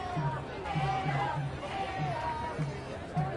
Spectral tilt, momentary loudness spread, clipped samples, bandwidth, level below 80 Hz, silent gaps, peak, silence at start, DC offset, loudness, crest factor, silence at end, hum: -6.5 dB/octave; 6 LU; under 0.1%; 11 kHz; -52 dBFS; none; -20 dBFS; 0 s; under 0.1%; -34 LUFS; 14 dB; 0 s; none